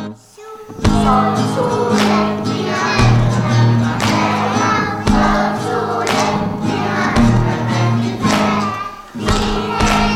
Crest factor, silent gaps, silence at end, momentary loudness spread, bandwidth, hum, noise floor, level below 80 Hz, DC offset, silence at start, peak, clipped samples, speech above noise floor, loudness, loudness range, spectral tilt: 14 dB; none; 0 s; 6 LU; 14 kHz; none; -35 dBFS; -28 dBFS; under 0.1%; 0 s; 0 dBFS; under 0.1%; 21 dB; -15 LUFS; 2 LU; -5.5 dB/octave